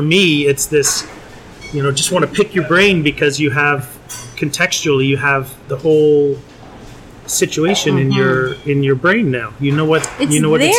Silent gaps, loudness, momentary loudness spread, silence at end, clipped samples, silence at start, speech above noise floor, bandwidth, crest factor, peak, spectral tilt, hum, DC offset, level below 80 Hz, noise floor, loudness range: none; -14 LUFS; 10 LU; 0 s; under 0.1%; 0 s; 21 dB; 17.5 kHz; 12 dB; -2 dBFS; -4 dB/octave; none; under 0.1%; -44 dBFS; -36 dBFS; 1 LU